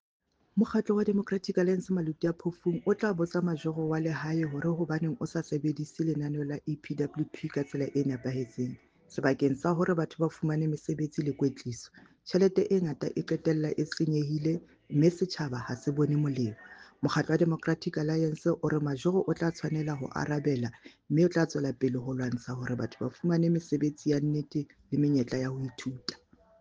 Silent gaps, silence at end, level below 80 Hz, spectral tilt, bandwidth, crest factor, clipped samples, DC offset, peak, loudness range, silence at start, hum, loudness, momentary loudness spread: none; 0.45 s; -66 dBFS; -7.5 dB/octave; 7.8 kHz; 18 dB; under 0.1%; under 0.1%; -12 dBFS; 3 LU; 0.55 s; none; -31 LUFS; 9 LU